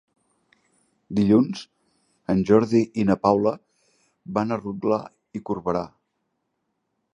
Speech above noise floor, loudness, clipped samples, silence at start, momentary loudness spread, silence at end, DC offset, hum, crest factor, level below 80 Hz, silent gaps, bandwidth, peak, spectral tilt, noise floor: 55 dB; -23 LUFS; under 0.1%; 1.1 s; 18 LU; 1.3 s; under 0.1%; none; 22 dB; -56 dBFS; none; 10 kHz; -4 dBFS; -8 dB/octave; -76 dBFS